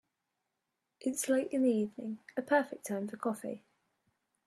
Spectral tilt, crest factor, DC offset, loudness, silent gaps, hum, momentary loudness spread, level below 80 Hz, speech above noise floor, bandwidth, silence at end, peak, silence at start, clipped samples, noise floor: -4.5 dB/octave; 20 dB; under 0.1%; -34 LUFS; none; none; 11 LU; -84 dBFS; 52 dB; 14 kHz; 0.9 s; -14 dBFS; 1 s; under 0.1%; -86 dBFS